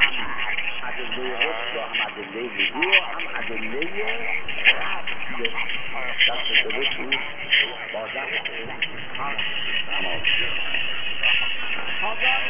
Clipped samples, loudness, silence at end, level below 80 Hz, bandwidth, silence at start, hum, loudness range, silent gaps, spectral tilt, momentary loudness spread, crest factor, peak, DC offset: under 0.1%; -23 LUFS; 0 s; -60 dBFS; 3.9 kHz; 0 s; none; 2 LU; none; -5.5 dB/octave; 10 LU; 22 dB; -2 dBFS; under 0.1%